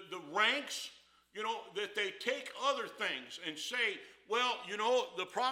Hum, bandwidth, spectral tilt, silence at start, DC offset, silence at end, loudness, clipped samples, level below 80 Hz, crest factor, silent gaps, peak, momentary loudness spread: 60 Hz at -80 dBFS; 16.5 kHz; -1 dB/octave; 0 s; under 0.1%; 0 s; -36 LUFS; under 0.1%; -86 dBFS; 22 dB; none; -16 dBFS; 10 LU